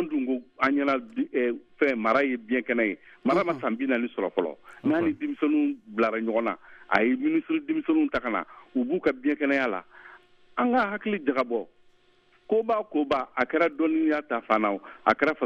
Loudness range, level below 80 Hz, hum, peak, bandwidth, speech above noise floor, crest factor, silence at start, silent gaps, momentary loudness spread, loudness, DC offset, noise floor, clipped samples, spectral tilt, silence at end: 2 LU; -64 dBFS; none; -4 dBFS; 7 kHz; 36 dB; 22 dB; 0 s; none; 7 LU; -26 LUFS; under 0.1%; -62 dBFS; under 0.1%; -7 dB/octave; 0 s